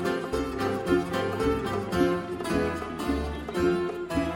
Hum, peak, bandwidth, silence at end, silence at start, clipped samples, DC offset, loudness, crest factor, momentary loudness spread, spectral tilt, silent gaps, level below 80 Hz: none; -12 dBFS; 17 kHz; 0 s; 0 s; under 0.1%; under 0.1%; -28 LUFS; 16 dB; 5 LU; -6 dB/octave; none; -42 dBFS